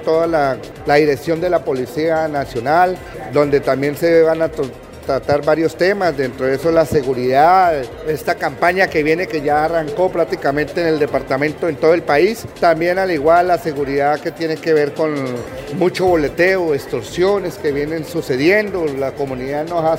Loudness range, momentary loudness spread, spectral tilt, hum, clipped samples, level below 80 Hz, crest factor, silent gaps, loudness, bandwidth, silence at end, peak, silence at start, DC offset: 2 LU; 8 LU; -6 dB/octave; none; under 0.1%; -44 dBFS; 16 dB; none; -16 LUFS; 16 kHz; 0 s; 0 dBFS; 0 s; under 0.1%